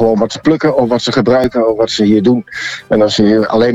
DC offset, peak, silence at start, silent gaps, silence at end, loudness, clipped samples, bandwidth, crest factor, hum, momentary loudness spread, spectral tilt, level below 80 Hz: under 0.1%; -2 dBFS; 0 s; none; 0 s; -12 LUFS; under 0.1%; 9.2 kHz; 10 dB; none; 5 LU; -5.5 dB/octave; -42 dBFS